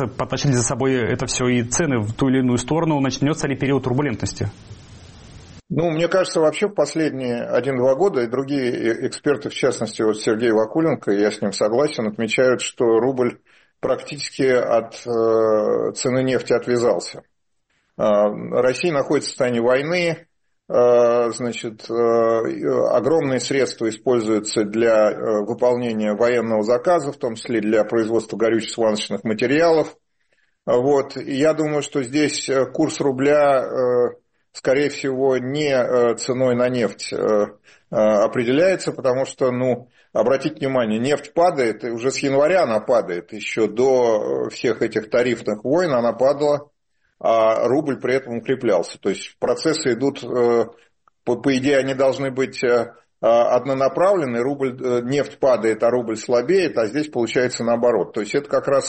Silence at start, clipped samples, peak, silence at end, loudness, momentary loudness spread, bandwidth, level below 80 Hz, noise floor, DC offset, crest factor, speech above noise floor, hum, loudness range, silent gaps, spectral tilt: 0 s; under 0.1%; -6 dBFS; 0 s; -20 LUFS; 7 LU; 8.8 kHz; -54 dBFS; -69 dBFS; under 0.1%; 12 dB; 50 dB; none; 2 LU; none; -5 dB/octave